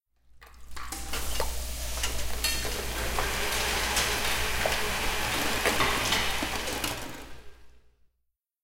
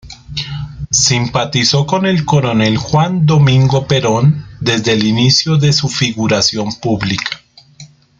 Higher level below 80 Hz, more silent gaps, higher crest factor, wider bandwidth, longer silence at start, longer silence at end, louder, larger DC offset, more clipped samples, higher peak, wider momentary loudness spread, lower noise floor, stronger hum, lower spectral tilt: about the same, -38 dBFS vs -42 dBFS; neither; first, 20 dB vs 14 dB; first, 17 kHz vs 9.4 kHz; first, 0.3 s vs 0.05 s; first, 0.85 s vs 0.35 s; second, -28 LUFS vs -13 LUFS; neither; neither; second, -10 dBFS vs 0 dBFS; about the same, 12 LU vs 11 LU; first, -79 dBFS vs -40 dBFS; neither; second, -2 dB/octave vs -4.5 dB/octave